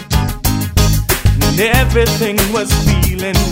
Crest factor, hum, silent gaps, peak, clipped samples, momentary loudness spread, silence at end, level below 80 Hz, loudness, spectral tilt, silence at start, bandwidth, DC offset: 12 dB; none; none; 0 dBFS; under 0.1%; 4 LU; 0 s; -18 dBFS; -13 LUFS; -4.5 dB/octave; 0 s; 16.5 kHz; under 0.1%